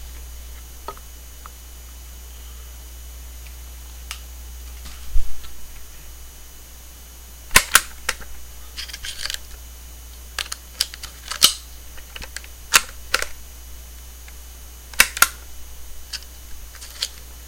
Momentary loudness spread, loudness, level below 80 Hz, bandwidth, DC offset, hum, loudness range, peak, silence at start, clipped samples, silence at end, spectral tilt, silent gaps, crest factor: 24 LU; -21 LUFS; -36 dBFS; 17 kHz; under 0.1%; none; 16 LU; 0 dBFS; 0 s; under 0.1%; 0 s; 0 dB/octave; none; 26 dB